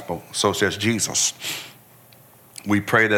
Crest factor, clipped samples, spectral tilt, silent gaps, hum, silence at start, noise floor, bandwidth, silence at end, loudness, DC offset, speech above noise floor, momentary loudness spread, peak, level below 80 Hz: 18 dB; under 0.1%; -3 dB/octave; none; none; 0 s; -50 dBFS; 18 kHz; 0 s; -21 LUFS; under 0.1%; 29 dB; 16 LU; -4 dBFS; -60 dBFS